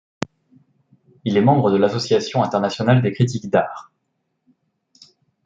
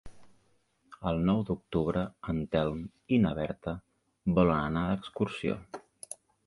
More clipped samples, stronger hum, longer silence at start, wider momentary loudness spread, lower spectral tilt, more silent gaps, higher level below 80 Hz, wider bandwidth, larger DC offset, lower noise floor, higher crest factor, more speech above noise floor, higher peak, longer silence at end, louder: neither; neither; first, 1.25 s vs 0.05 s; about the same, 16 LU vs 16 LU; about the same, -7 dB/octave vs -7.5 dB/octave; neither; second, -62 dBFS vs -50 dBFS; second, 7.8 kHz vs 11.5 kHz; neither; about the same, -73 dBFS vs -70 dBFS; about the same, 18 dB vs 22 dB; first, 55 dB vs 40 dB; first, -4 dBFS vs -10 dBFS; first, 1.65 s vs 0.35 s; first, -19 LUFS vs -31 LUFS